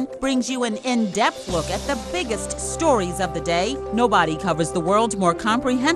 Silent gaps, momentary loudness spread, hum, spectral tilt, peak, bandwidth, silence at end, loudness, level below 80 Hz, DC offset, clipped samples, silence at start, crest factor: none; 6 LU; none; -4 dB/octave; -4 dBFS; 12.5 kHz; 0 s; -21 LUFS; -40 dBFS; under 0.1%; under 0.1%; 0 s; 16 dB